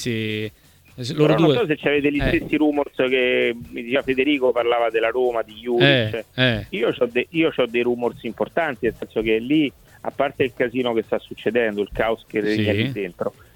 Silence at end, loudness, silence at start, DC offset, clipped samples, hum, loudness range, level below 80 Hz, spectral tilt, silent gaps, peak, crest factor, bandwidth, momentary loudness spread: 0.25 s; -21 LUFS; 0 s; under 0.1%; under 0.1%; none; 3 LU; -44 dBFS; -6.5 dB/octave; none; -2 dBFS; 18 dB; 18 kHz; 9 LU